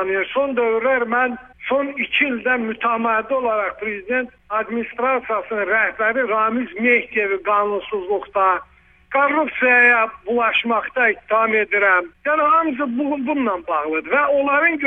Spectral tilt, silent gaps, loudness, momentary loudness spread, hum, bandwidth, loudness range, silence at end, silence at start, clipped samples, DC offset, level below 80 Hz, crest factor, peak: -6.5 dB/octave; none; -18 LUFS; 8 LU; none; 3.8 kHz; 4 LU; 0 s; 0 s; under 0.1%; under 0.1%; -56 dBFS; 16 dB; -2 dBFS